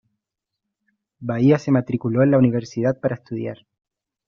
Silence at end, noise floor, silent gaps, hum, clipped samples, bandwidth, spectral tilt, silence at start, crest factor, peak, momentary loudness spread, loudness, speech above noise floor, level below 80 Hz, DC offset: 0.75 s; -83 dBFS; none; none; under 0.1%; 7.2 kHz; -8.5 dB/octave; 1.2 s; 18 dB; -4 dBFS; 13 LU; -20 LUFS; 64 dB; -60 dBFS; under 0.1%